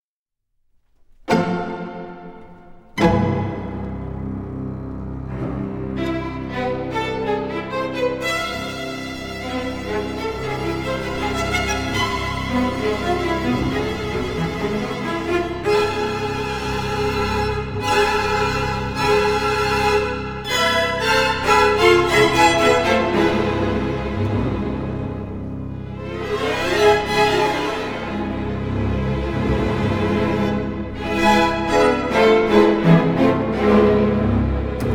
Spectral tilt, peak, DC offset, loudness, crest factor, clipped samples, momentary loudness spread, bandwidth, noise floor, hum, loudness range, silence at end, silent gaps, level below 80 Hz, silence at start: -5.5 dB/octave; -2 dBFS; 0.3%; -20 LUFS; 18 dB; under 0.1%; 13 LU; 19.5 kHz; -81 dBFS; none; 9 LU; 0 s; none; -34 dBFS; 1.25 s